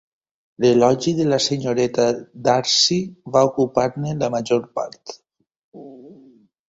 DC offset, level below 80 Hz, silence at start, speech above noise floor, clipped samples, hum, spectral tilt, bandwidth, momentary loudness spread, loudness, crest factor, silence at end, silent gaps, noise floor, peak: under 0.1%; -58 dBFS; 0.6 s; 32 dB; under 0.1%; none; -4.5 dB/octave; 8 kHz; 10 LU; -19 LUFS; 18 dB; 0.55 s; 5.56-5.72 s; -51 dBFS; -2 dBFS